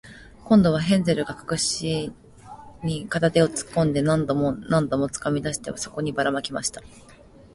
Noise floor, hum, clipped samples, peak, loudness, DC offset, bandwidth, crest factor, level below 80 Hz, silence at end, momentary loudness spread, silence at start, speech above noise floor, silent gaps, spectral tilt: -44 dBFS; none; under 0.1%; -6 dBFS; -23 LUFS; under 0.1%; 11.5 kHz; 18 dB; -50 dBFS; 0.55 s; 10 LU; 0.05 s; 21 dB; none; -5 dB/octave